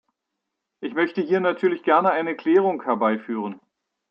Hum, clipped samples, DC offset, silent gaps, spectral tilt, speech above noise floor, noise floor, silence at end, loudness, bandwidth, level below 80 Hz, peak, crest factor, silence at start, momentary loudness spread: none; under 0.1%; under 0.1%; none; -8 dB/octave; 60 dB; -81 dBFS; 0.55 s; -22 LUFS; 5.6 kHz; -78 dBFS; -6 dBFS; 18 dB; 0.8 s; 11 LU